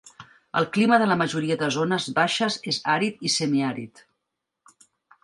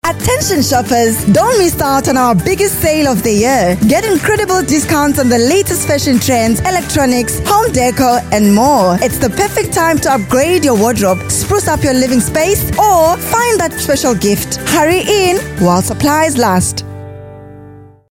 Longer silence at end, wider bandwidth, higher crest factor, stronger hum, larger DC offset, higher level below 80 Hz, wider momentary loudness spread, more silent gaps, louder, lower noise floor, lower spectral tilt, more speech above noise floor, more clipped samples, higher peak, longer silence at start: first, 1.35 s vs 0.3 s; second, 11.5 kHz vs 17 kHz; first, 20 dB vs 12 dB; neither; neither; second, -68 dBFS vs -32 dBFS; first, 8 LU vs 4 LU; neither; second, -23 LUFS vs -11 LUFS; first, -82 dBFS vs -36 dBFS; about the same, -4 dB/octave vs -4.5 dB/octave; first, 59 dB vs 25 dB; neither; second, -4 dBFS vs 0 dBFS; about the same, 0.05 s vs 0.05 s